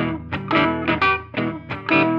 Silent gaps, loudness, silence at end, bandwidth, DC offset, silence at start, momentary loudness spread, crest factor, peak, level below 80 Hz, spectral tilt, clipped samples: none; -21 LUFS; 0 s; 6.4 kHz; under 0.1%; 0 s; 9 LU; 18 dB; -4 dBFS; -46 dBFS; -7.5 dB/octave; under 0.1%